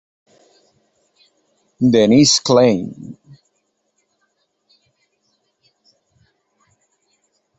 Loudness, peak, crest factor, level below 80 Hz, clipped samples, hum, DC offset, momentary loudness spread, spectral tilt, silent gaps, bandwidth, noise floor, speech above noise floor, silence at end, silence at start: -13 LUFS; -2 dBFS; 20 dB; -58 dBFS; under 0.1%; none; under 0.1%; 23 LU; -4.5 dB/octave; none; 8.2 kHz; -69 dBFS; 56 dB; 4.45 s; 1.8 s